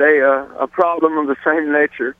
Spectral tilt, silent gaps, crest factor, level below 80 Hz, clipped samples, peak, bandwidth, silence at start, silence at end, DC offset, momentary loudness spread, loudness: -7 dB/octave; none; 16 dB; -60 dBFS; under 0.1%; 0 dBFS; 3.8 kHz; 0 s; 0.1 s; under 0.1%; 5 LU; -16 LUFS